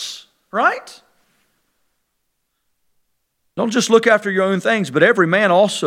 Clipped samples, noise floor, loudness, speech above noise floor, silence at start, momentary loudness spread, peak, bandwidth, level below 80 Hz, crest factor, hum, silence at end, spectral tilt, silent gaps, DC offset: under 0.1%; -71 dBFS; -16 LUFS; 56 dB; 0 s; 16 LU; 0 dBFS; 15.5 kHz; -70 dBFS; 18 dB; none; 0 s; -4.5 dB/octave; none; under 0.1%